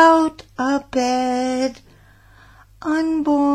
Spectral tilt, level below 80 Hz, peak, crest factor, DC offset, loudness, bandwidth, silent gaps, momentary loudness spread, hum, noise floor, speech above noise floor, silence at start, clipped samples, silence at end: -4 dB/octave; -52 dBFS; -2 dBFS; 18 dB; under 0.1%; -20 LUFS; 10.5 kHz; none; 7 LU; none; -49 dBFS; 31 dB; 0 s; under 0.1%; 0 s